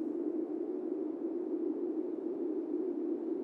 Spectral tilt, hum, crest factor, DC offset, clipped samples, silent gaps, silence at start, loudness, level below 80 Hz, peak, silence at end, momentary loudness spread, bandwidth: -9.5 dB/octave; none; 12 dB; under 0.1%; under 0.1%; none; 0 s; -37 LUFS; under -90 dBFS; -24 dBFS; 0 s; 2 LU; 2.8 kHz